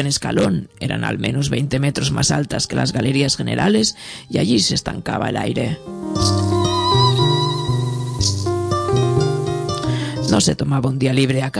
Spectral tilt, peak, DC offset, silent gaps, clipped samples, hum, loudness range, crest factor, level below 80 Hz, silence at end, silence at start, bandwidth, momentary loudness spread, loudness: -5 dB/octave; -2 dBFS; under 0.1%; none; under 0.1%; none; 1 LU; 16 dB; -40 dBFS; 0 s; 0 s; 11 kHz; 7 LU; -18 LUFS